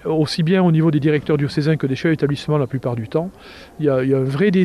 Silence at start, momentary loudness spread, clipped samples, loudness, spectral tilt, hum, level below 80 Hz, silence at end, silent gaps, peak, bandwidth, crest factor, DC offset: 0.05 s; 8 LU; under 0.1%; -18 LUFS; -8 dB/octave; none; -50 dBFS; 0 s; none; -4 dBFS; 11.5 kHz; 14 dB; under 0.1%